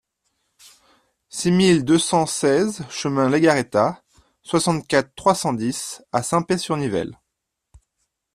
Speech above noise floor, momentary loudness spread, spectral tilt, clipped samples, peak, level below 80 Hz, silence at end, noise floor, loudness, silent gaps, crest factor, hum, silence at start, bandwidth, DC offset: 60 dB; 9 LU; -5 dB/octave; under 0.1%; -2 dBFS; -56 dBFS; 1.2 s; -80 dBFS; -20 LUFS; none; 20 dB; none; 1.35 s; 14 kHz; under 0.1%